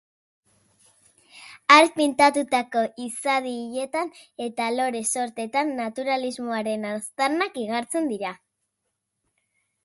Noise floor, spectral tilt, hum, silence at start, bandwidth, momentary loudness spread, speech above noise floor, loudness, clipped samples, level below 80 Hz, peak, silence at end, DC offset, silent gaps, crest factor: -79 dBFS; -2.5 dB/octave; none; 1.35 s; 12 kHz; 13 LU; 56 dB; -23 LUFS; under 0.1%; -74 dBFS; 0 dBFS; 1.5 s; under 0.1%; none; 24 dB